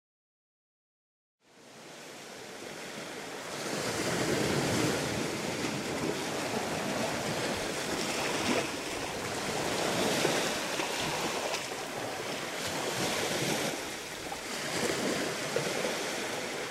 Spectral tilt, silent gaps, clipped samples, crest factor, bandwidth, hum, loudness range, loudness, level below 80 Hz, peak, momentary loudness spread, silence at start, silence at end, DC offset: -3 dB/octave; none; under 0.1%; 20 dB; 16 kHz; none; 5 LU; -32 LUFS; -62 dBFS; -14 dBFS; 11 LU; 1.55 s; 0 s; under 0.1%